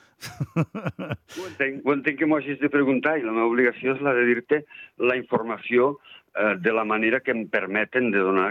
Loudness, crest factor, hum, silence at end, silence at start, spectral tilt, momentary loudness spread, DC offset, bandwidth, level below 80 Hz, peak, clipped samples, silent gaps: -23 LUFS; 16 dB; none; 0 s; 0.2 s; -7 dB/octave; 12 LU; under 0.1%; 14.5 kHz; -70 dBFS; -8 dBFS; under 0.1%; none